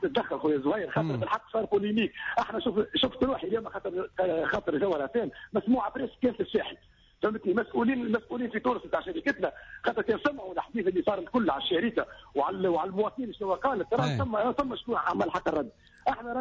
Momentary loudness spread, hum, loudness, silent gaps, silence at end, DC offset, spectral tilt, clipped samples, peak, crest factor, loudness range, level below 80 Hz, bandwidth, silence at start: 6 LU; none; -30 LUFS; none; 0 s; under 0.1%; -7 dB/octave; under 0.1%; -16 dBFS; 14 dB; 1 LU; -56 dBFS; 7.6 kHz; 0 s